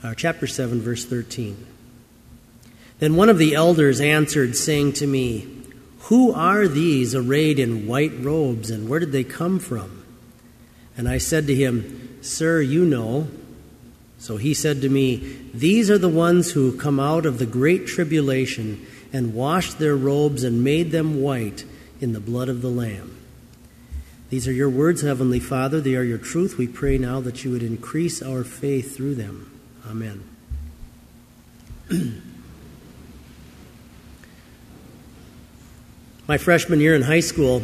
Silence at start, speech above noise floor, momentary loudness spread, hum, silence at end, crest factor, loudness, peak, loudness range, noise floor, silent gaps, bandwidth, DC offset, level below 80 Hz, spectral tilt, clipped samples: 0 s; 28 dB; 18 LU; none; 0 s; 20 dB; -21 LUFS; -2 dBFS; 13 LU; -48 dBFS; none; 15 kHz; under 0.1%; -42 dBFS; -5.5 dB/octave; under 0.1%